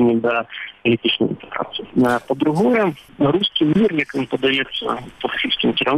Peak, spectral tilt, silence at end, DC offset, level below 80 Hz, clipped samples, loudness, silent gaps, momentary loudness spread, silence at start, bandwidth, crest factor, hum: -6 dBFS; -6.5 dB/octave; 0 s; under 0.1%; -52 dBFS; under 0.1%; -19 LUFS; none; 9 LU; 0 s; 13.5 kHz; 12 dB; none